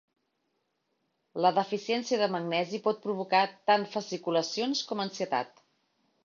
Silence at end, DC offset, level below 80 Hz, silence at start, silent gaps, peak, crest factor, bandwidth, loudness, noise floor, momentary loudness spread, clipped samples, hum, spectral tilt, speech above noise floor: 0.75 s; under 0.1%; -80 dBFS; 1.35 s; none; -10 dBFS; 20 dB; 7.4 kHz; -29 LUFS; -78 dBFS; 7 LU; under 0.1%; none; -4 dB/octave; 49 dB